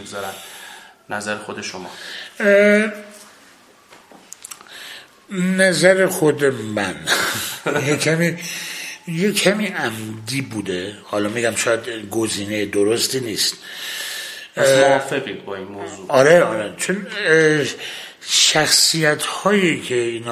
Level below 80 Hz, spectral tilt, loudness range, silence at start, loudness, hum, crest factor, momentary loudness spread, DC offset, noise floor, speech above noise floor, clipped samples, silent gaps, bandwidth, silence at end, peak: -58 dBFS; -3 dB/octave; 5 LU; 0 s; -18 LUFS; none; 20 dB; 18 LU; under 0.1%; -49 dBFS; 30 dB; under 0.1%; none; 15.5 kHz; 0 s; 0 dBFS